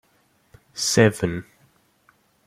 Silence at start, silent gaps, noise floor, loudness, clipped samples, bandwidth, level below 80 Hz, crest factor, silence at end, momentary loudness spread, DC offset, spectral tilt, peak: 0.75 s; none; -63 dBFS; -20 LUFS; under 0.1%; 15.5 kHz; -54 dBFS; 22 dB; 1.05 s; 17 LU; under 0.1%; -4.5 dB/octave; -2 dBFS